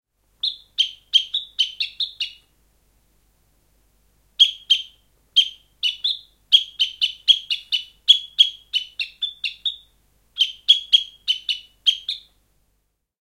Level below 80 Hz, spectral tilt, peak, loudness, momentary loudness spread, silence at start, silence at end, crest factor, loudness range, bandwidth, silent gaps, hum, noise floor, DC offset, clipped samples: -64 dBFS; 4 dB/octave; 0 dBFS; -19 LUFS; 12 LU; 0.45 s; 1.05 s; 22 dB; 6 LU; 16.5 kHz; none; 50 Hz at -65 dBFS; -71 dBFS; under 0.1%; under 0.1%